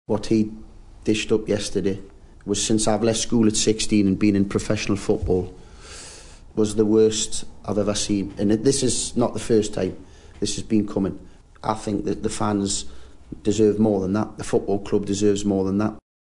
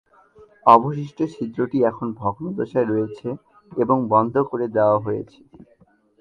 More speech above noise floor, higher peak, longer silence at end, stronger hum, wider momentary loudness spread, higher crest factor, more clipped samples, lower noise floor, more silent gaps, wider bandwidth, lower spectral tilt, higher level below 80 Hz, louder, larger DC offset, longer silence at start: second, 21 dB vs 31 dB; second, -6 dBFS vs 0 dBFS; second, 0.35 s vs 0.95 s; neither; second, 11 LU vs 15 LU; second, 16 dB vs 22 dB; neither; second, -42 dBFS vs -51 dBFS; neither; first, 11 kHz vs 7.4 kHz; second, -5 dB/octave vs -9 dB/octave; first, -42 dBFS vs -60 dBFS; about the same, -22 LUFS vs -21 LUFS; neither; second, 0.1 s vs 0.65 s